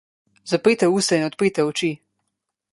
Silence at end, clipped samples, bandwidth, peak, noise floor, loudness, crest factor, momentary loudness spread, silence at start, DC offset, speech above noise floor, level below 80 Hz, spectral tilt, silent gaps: 0.75 s; under 0.1%; 11.5 kHz; -4 dBFS; -79 dBFS; -20 LUFS; 18 dB; 11 LU; 0.45 s; under 0.1%; 59 dB; -64 dBFS; -4.5 dB/octave; none